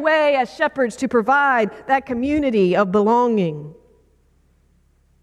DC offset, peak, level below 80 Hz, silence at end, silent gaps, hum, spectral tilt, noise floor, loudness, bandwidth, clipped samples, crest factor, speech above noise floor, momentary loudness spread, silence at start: under 0.1%; -6 dBFS; -52 dBFS; 1.5 s; none; none; -6 dB/octave; -58 dBFS; -18 LUFS; 11.5 kHz; under 0.1%; 14 dB; 40 dB; 6 LU; 0 s